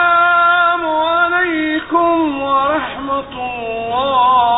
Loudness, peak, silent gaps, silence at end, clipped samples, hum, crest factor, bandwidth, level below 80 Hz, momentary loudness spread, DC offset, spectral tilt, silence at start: -14 LUFS; -2 dBFS; none; 0 s; under 0.1%; none; 12 dB; 4 kHz; -46 dBFS; 11 LU; under 0.1%; -9.5 dB/octave; 0 s